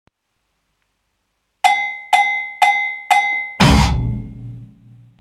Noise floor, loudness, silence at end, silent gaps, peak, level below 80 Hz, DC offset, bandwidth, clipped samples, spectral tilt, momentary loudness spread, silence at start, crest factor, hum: -71 dBFS; -16 LUFS; 0.55 s; none; 0 dBFS; -28 dBFS; under 0.1%; 16 kHz; under 0.1%; -4.5 dB/octave; 15 LU; 1.65 s; 18 dB; none